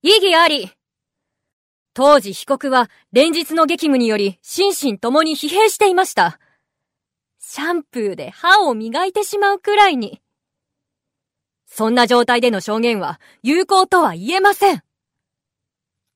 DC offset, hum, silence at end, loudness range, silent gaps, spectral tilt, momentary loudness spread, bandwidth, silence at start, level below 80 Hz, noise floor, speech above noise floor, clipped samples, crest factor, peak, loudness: under 0.1%; none; 1.35 s; 3 LU; 1.53-1.86 s; -3 dB/octave; 11 LU; 16 kHz; 0.05 s; -64 dBFS; -83 dBFS; 67 dB; under 0.1%; 16 dB; 0 dBFS; -16 LUFS